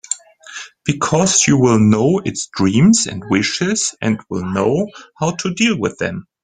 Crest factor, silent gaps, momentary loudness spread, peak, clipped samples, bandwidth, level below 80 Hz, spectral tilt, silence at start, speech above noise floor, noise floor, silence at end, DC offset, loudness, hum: 16 dB; none; 12 LU; 0 dBFS; under 0.1%; 9.8 kHz; -50 dBFS; -4.5 dB/octave; 0.1 s; 20 dB; -35 dBFS; 0.2 s; under 0.1%; -16 LUFS; none